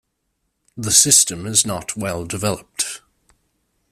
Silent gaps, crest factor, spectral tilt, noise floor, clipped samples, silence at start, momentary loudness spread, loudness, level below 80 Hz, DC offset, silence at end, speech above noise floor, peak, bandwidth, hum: none; 22 dB; -2 dB/octave; -72 dBFS; under 0.1%; 0.75 s; 14 LU; -16 LUFS; -52 dBFS; under 0.1%; 0.95 s; 53 dB; 0 dBFS; 16 kHz; none